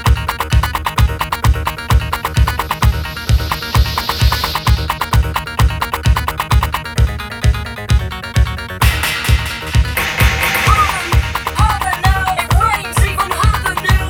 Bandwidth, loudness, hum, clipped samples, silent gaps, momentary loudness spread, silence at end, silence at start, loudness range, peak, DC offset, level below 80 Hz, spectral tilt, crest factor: 18.5 kHz; -15 LUFS; none; under 0.1%; none; 4 LU; 0 s; 0 s; 3 LU; 0 dBFS; under 0.1%; -18 dBFS; -4.5 dB/octave; 14 dB